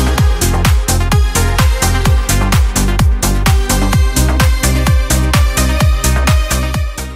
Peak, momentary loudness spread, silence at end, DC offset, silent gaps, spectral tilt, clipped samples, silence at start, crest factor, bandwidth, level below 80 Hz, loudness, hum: 0 dBFS; 1 LU; 0 s; under 0.1%; none; -4.5 dB/octave; under 0.1%; 0 s; 10 dB; 16.5 kHz; -14 dBFS; -13 LUFS; none